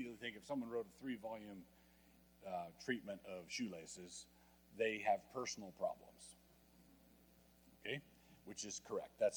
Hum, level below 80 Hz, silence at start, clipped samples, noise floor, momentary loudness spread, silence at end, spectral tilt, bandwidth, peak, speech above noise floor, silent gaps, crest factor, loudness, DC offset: none; -78 dBFS; 0 s; under 0.1%; -69 dBFS; 19 LU; 0 s; -3.5 dB/octave; 19.5 kHz; -26 dBFS; 24 dB; none; 22 dB; -46 LUFS; under 0.1%